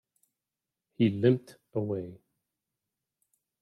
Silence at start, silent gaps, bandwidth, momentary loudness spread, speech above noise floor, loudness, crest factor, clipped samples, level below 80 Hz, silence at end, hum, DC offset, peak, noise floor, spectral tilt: 1 s; none; 12 kHz; 12 LU; 61 dB; -29 LUFS; 22 dB; under 0.1%; -76 dBFS; 1.45 s; none; under 0.1%; -10 dBFS; -89 dBFS; -9 dB/octave